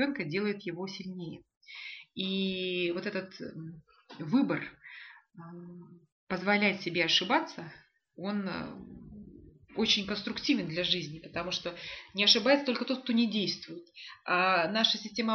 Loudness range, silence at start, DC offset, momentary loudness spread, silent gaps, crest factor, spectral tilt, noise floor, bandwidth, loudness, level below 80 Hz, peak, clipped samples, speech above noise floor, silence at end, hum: 8 LU; 0 s; under 0.1%; 22 LU; 1.57-1.61 s, 6.12-6.27 s; 26 dB; -2 dB/octave; -53 dBFS; 6.8 kHz; -30 LUFS; -66 dBFS; -8 dBFS; under 0.1%; 22 dB; 0 s; none